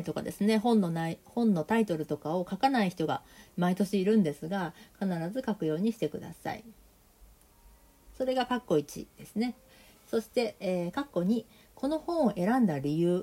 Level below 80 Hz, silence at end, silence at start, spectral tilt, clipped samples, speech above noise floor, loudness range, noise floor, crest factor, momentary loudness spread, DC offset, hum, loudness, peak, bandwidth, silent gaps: -62 dBFS; 0 s; 0 s; -6.5 dB/octave; under 0.1%; 29 dB; 6 LU; -59 dBFS; 18 dB; 10 LU; under 0.1%; none; -30 LUFS; -12 dBFS; 16 kHz; none